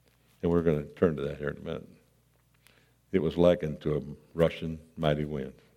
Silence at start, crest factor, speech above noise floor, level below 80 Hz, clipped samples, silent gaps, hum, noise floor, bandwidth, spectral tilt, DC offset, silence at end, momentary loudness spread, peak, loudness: 0.45 s; 22 dB; 37 dB; -54 dBFS; under 0.1%; none; none; -66 dBFS; 14 kHz; -8 dB/octave; under 0.1%; 0.25 s; 14 LU; -10 dBFS; -30 LUFS